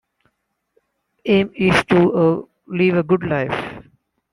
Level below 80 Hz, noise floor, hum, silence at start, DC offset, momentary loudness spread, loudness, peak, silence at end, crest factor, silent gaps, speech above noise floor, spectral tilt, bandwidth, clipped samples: -50 dBFS; -71 dBFS; none; 1.25 s; under 0.1%; 13 LU; -18 LUFS; -2 dBFS; 0.5 s; 18 dB; none; 54 dB; -7 dB/octave; 11.5 kHz; under 0.1%